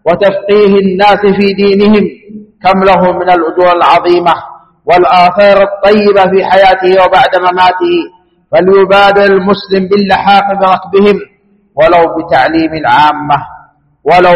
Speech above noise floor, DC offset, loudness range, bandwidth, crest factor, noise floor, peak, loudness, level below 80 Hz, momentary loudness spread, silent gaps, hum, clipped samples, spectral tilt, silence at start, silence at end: 32 dB; under 0.1%; 2 LU; 8.6 kHz; 8 dB; -38 dBFS; 0 dBFS; -7 LUFS; -38 dBFS; 7 LU; none; none; 1%; -7 dB/octave; 0.05 s; 0 s